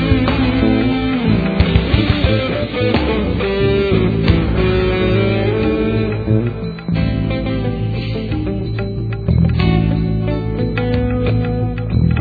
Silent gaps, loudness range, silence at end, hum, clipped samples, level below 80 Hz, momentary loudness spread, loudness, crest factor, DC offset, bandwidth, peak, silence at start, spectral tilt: none; 3 LU; 0 s; none; under 0.1%; -24 dBFS; 6 LU; -16 LUFS; 16 dB; under 0.1%; 4.9 kHz; 0 dBFS; 0 s; -10 dB/octave